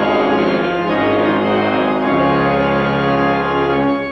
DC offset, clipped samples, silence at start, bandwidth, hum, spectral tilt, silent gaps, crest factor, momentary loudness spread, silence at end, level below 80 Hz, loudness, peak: under 0.1%; under 0.1%; 0 s; 6.4 kHz; none; -8 dB/octave; none; 10 dB; 2 LU; 0 s; -42 dBFS; -15 LUFS; -4 dBFS